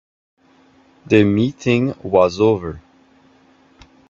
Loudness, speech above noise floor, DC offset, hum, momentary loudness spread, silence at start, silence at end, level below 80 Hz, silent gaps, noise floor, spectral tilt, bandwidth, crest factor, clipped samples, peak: -17 LUFS; 37 dB; under 0.1%; none; 10 LU; 1.1 s; 1.3 s; -52 dBFS; none; -53 dBFS; -7 dB/octave; 7.4 kHz; 20 dB; under 0.1%; 0 dBFS